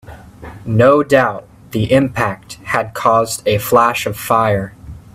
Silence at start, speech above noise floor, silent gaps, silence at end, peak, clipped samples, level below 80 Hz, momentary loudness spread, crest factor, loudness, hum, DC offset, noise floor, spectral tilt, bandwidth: 0.1 s; 20 dB; none; 0.15 s; 0 dBFS; under 0.1%; -44 dBFS; 18 LU; 16 dB; -15 LUFS; none; under 0.1%; -35 dBFS; -5.5 dB/octave; 16 kHz